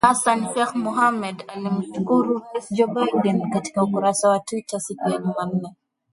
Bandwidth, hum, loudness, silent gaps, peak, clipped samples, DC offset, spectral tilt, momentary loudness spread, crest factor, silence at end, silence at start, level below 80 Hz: 11.5 kHz; none; -22 LUFS; none; -2 dBFS; under 0.1%; under 0.1%; -5 dB/octave; 9 LU; 20 dB; 0.4 s; 0.05 s; -62 dBFS